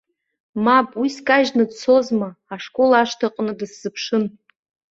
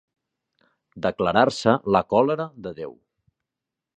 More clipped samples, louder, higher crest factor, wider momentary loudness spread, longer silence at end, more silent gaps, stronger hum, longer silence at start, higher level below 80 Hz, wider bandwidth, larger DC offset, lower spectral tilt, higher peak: neither; first, -19 LUFS vs -22 LUFS; about the same, 18 dB vs 22 dB; about the same, 13 LU vs 15 LU; second, 0.65 s vs 1.05 s; neither; neither; second, 0.55 s vs 0.95 s; second, -64 dBFS vs -56 dBFS; second, 7.8 kHz vs 10 kHz; neither; second, -4.5 dB/octave vs -6 dB/octave; about the same, -2 dBFS vs -2 dBFS